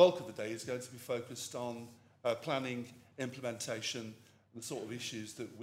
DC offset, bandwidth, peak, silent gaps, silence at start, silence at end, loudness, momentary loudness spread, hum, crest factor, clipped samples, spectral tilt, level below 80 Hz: under 0.1%; 16 kHz; -12 dBFS; none; 0 s; 0 s; -39 LUFS; 12 LU; none; 26 dB; under 0.1%; -4 dB/octave; -82 dBFS